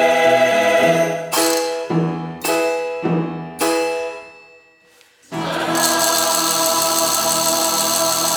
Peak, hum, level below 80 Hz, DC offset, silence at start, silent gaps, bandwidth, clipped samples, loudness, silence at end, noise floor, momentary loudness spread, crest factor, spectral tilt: -2 dBFS; none; -62 dBFS; under 0.1%; 0 s; none; over 20 kHz; under 0.1%; -17 LUFS; 0 s; -52 dBFS; 9 LU; 16 dB; -2.5 dB/octave